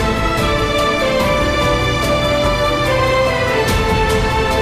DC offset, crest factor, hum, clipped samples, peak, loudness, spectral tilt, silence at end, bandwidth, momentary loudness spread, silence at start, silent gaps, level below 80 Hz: under 0.1%; 10 dB; none; under 0.1%; -6 dBFS; -15 LUFS; -5 dB/octave; 0 s; 15.5 kHz; 1 LU; 0 s; none; -24 dBFS